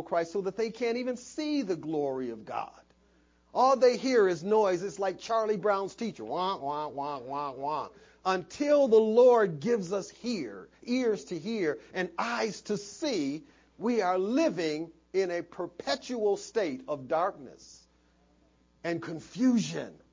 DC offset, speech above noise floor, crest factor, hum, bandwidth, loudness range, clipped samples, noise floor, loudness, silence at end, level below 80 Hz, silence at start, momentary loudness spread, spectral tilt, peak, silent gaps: under 0.1%; 36 dB; 18 dB; none; 7.6 kHz; 7 LU; under 0.1%; -66 dBFS; -30 LUFS; 0.15 s; -70 dBFS; 0 s; 12 LU; -5 dB/octave; -12 dBFS; none